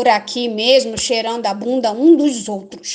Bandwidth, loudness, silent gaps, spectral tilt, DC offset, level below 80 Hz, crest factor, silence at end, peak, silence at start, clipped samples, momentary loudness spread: 9.8 kHz; -15 LUFS; none; -3 dB/octave; under 0.1%; -54 dBFS; 16 dB; 0 s; 0 dBFS; 0 s; under 0.1%; 11 LU